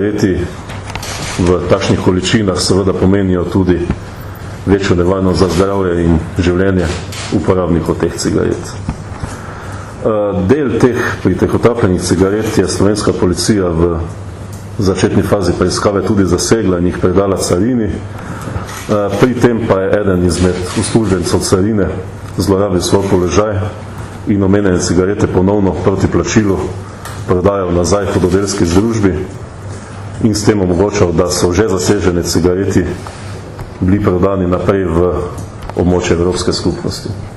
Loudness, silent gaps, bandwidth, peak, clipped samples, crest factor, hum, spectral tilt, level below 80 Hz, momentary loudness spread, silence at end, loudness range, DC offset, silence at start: -13 LUFS; none; 13.5 kHz; 0 dBFS; under 0.1%; 12 dB; none; -6 dB/octave; -30 dBFS; 13 LU; 0 s; 2 LU; under 0.1%; 0 s